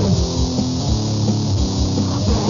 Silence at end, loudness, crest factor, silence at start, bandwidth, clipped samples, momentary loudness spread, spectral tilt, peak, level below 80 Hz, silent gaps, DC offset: 0 s; -19 LUFS; 12 dB; 0 s; 7.4 kHz; under 0.1%; 1 LU; -6 dB/octave; -6 dBFS; -26 dBFS; none; 0.4%